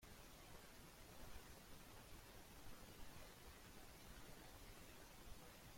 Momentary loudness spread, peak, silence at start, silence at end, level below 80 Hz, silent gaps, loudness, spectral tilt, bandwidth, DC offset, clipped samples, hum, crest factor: 1 LU; -44 dBFS; 0 s; 0 s; -66 dBFS; none; -61 LUFS; -3.5 dB/octave; 16.5 kHz; under 0.1%; under 0.1%; none; 16 dB